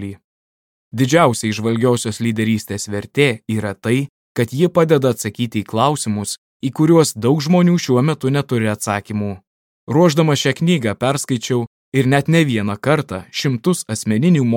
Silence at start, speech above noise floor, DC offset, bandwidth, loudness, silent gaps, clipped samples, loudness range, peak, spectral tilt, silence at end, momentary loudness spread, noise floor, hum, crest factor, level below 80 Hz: 0 s; over 74 dB; under 0.1%; 17 kHz; -17 LUFS; 0.24-0.91 s, 4.09-4.35 s, 6.38-6.60 s, 9.47-9.87 s, 11.67-11.92 s; under 0.1%; 2 LU; 0 dBFS; -5.5 dB/octave; 0 s; 9 LU; under -90 dBFS; none; 16 dB; -58 dBFS